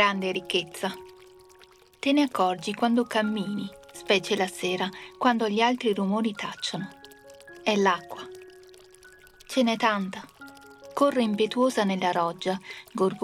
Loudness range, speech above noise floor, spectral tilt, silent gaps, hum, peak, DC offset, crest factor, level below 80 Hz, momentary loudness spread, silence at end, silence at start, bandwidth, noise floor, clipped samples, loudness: 4 LU; 29 dB; -4.5 dB/octave; none; none; -8 dBFS; under 0.1%; 20 dB; -68 dBFS; 17 LU; 0 s; 0 s; 15 kHz; -55 dBFS; under 0.1%; -26 LUFS